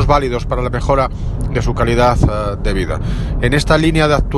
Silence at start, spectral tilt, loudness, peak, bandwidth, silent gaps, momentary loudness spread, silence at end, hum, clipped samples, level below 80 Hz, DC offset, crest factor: 0 s; -6.5 dB/octave; -16 LUFS; 0 dBFS; 12 kHz; none; 7 LU; 0 s; none; under 0.1%; -20 dBFS; under 0.1%; 14 dB